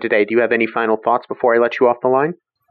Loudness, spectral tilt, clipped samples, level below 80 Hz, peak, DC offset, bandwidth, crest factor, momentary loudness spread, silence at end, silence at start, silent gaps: -16 LUFS; -4 dB/octave; under 0.1%; -72 dBFS; -4 dBFS; under 0.1%; 6 kHz; 14 dB; 3 LU; 0.35 s; 0 s; none